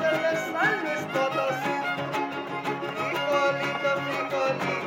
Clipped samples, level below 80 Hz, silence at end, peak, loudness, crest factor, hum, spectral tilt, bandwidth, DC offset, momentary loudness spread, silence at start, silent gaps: under 0.1%; -74 dBFS; 0 s; -12 dBFS; -27 LUFS; 14 dB; none; -4.5 dB/octave; 17 kHz; under 0.1%; 6 LU; 0 s; none